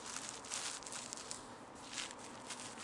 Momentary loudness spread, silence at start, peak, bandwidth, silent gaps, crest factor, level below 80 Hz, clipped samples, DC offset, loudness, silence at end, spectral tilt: 8 LU; 0 s; -20 dBFS; 11.5 kHz; none; 26 dB; -74 dBFS; under 0.1%; under 0.1%; -45 LUFS; 0 s; -0.5 dB/octave